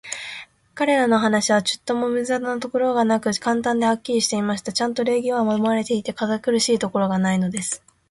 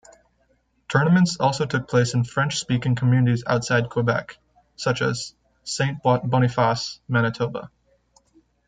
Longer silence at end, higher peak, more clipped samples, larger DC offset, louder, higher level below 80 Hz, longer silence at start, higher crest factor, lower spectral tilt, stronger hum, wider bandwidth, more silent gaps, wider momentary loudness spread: second, 0.35 s vs 1 s; about the same, -6 dBFS vs -4 dBFS; neither; neither; about the same, -21 LUFS vs -22 LUFS; second, -62 dBFS vs -56 dBFS; second, 0.05 s vs 0.9 s; about the same, 16 dB vs 20 dB; second, -4 dB/octave vs -5.5 dB/octave; neither; first, 11.5 kHz vs 9.4 kHz; neither; about the same, 7 LU vs 9 LU